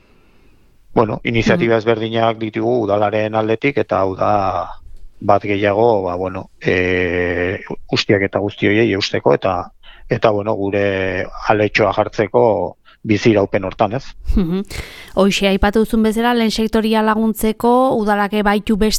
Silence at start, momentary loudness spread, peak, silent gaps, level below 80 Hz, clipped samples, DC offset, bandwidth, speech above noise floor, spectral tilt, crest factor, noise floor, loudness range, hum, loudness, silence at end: 0.9 s; 8 LU; 0 dBFS; none; -34 dBFS; under 0.1%; under 0.1%; 15.5 kHz; 33 dB; -5.5 dB/octave; 16 dB; -49 dBFS; 2 LU; none; -16 LUFS; 0 s